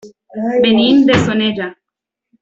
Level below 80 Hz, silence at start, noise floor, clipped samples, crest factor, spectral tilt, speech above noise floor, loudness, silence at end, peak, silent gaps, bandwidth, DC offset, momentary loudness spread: -48 dBFS; 0.05 s; -82 dBFS; under 0.1%; 12 dB; -6 dB/octave; 69 dB; -13 LUFS; 0.7 s; -2 dBFS; none; 7.8 kHz; under 0.1%; 15 LU